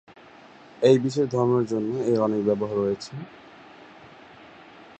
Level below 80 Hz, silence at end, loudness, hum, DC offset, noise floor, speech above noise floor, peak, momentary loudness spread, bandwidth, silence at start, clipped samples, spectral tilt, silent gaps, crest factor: -64 dBFS; 0.35 s; -23 LUFS; none; under 0.1%; -49 dBFS; 26 dB; -6 dBFS; 14 LU; 8.6 kHz; 0.8 s; under 0.1%; -7 dB/octave; none; 20 dB